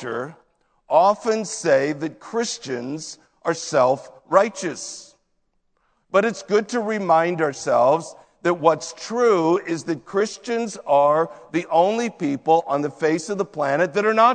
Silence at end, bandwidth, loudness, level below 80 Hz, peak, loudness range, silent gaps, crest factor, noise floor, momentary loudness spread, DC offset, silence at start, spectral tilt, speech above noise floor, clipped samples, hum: 0 s; 9.4 kHz; -21 LUFS; -70 dBFS; 0 dBFS; 3 LU; none; 20 dB; -68 dBFS; 11 LU; under 0.1%; 0 s; -4.5 dB/octave; 48 dB; under 0.1%; none